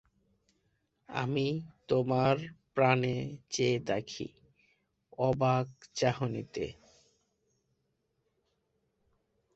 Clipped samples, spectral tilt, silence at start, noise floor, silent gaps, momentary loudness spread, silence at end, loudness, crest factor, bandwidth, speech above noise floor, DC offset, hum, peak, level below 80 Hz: under 0.1%; -6 dB/octave; 1.1 s; -79 dBFS; none; 12 LU; 2.85 s; -32 LUFS; 24 dB; 8.2 kHz; 48 dB; under 0.1%; none; -10 dBFS; -64 dBFS